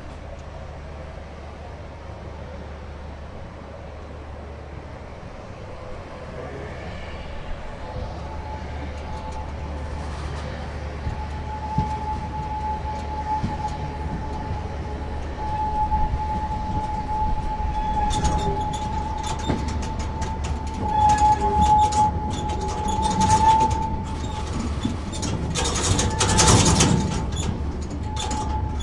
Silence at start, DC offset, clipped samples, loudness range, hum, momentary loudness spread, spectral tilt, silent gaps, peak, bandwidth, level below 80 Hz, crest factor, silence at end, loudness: 0 s; under 0.1%; under 0.1%; 17 LU; none; 20 LU; -4.5 dB/octave; none; -2 dBFS; 11.5 kHz; -32 dBFS; 22 dB; 0 s; -24 LUFS